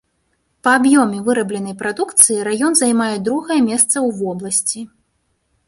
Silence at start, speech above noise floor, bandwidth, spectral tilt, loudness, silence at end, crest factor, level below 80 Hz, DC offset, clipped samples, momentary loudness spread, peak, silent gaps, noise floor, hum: 0.65 s; 50 dB; 16 kHz; -3 dB/octave; -15 LUFS; 0.8 s; 18 dB; -60 dBFS; under 0.1%; under 0.1%; 12 LU; 0 dBFS; none; -66 dBFS; none